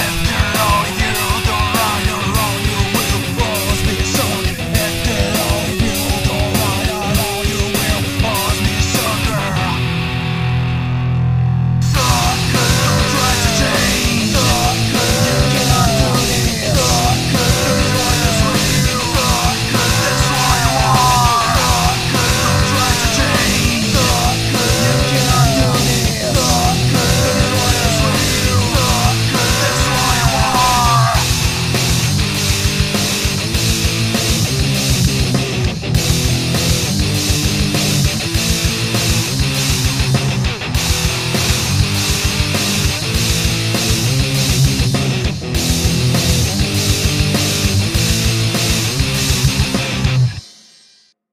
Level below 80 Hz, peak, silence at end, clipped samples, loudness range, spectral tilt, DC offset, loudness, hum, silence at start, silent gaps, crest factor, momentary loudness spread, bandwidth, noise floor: -24 dBFS; 0 dBFS; 0.85 s; under 0.1%; 3 LU; -4 dB/octave; under 0.1%; -14 LUFS; none; 0 s; none; 14 dB; 4 LU; 15.5 kHz; -51 dBFS